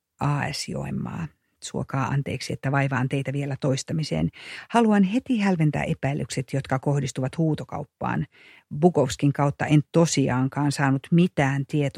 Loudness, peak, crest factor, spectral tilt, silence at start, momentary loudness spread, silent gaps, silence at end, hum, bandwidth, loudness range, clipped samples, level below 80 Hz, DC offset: -24 LUFS; -4 dBFS; 20 dB; -6 dB/octave; 0.2 s; 10 LU; none; 0 s; none; 12.5 kHz; 5 LU; under 0.1%; -52 dBFS; under 0.1%